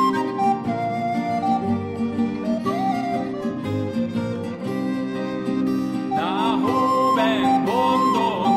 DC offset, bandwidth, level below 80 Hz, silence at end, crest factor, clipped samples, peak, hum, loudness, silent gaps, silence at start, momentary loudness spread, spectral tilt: under 0.1%; 14.5 kHz; -58 dBFS; 0 s; 14 dB; under 0.1%; -8 dBFS; none; -22 LUFS; none; 0 s; 8 LU; -6.5 dB/octave